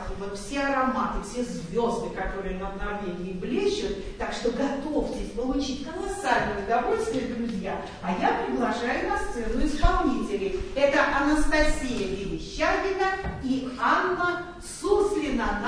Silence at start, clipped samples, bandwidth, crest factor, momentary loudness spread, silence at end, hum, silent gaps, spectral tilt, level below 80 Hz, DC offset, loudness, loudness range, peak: 0 s; under 0.1%; 10.5 kHz; 20 dB; 9 LU; 0 s; none; none; -5 dB/octave; -36 dBFS; 0.1%; -27 LUFS; 4 LU; -6 dBFS